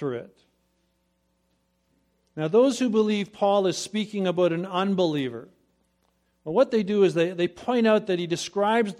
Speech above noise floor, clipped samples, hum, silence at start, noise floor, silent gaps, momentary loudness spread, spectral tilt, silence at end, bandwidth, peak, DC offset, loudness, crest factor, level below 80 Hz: 47 dB; under 0.1%; none; 0 s; -71 dBFS; none; 11 LU; -5.5 dB/octave; 0.05 s; 13.5 kHz; -8 dBFS; under 0.1%; -24 LUFS; 18 dB; -70 dBFS